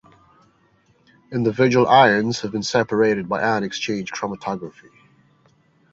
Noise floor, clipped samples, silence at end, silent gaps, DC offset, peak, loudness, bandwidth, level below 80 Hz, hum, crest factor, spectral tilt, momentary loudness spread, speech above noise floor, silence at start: -60 dBFS; under 0.1%; 1.2 s; none; under 0.1%; -2 dBFS; -20 LUFS; 8 kHz; -58 dBFS; none; 20 dB; -5 dB/octave; 15 LU; 40 dB; 1.3 s